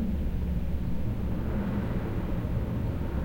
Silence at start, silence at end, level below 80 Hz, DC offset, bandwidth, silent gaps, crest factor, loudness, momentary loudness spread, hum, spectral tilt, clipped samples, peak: 0 s; 0 s; -34 dBFS; under 0.1%; 16.5 kHz; none; 12 dB; -32 LUFS; 2 LU; none; -9 dB/octave; under 0.1%; -18 dBFS